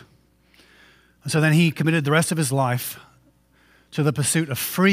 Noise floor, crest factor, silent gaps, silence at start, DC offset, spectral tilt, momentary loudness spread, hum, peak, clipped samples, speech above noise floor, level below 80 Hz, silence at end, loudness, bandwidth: -58 dBFS; 20 dB; none; 1.25 s; under 0.1%; -5 dB/octave; 14 LU; none; -4 dBFS; under 0.1%; 38 dB; -62 dBFS; 0 s; -21 LUFS; 16 kHz